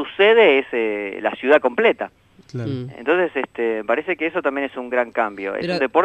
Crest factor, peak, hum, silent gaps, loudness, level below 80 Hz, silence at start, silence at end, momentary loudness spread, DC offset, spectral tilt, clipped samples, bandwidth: 18 dB; -2 dBFS; none; none; -19 LUFS; -62 dBFS; 0 s; 0 s; 13 LU; under 0.1%; -6.5 dB/octave; under 0.1%; 8.4 kHz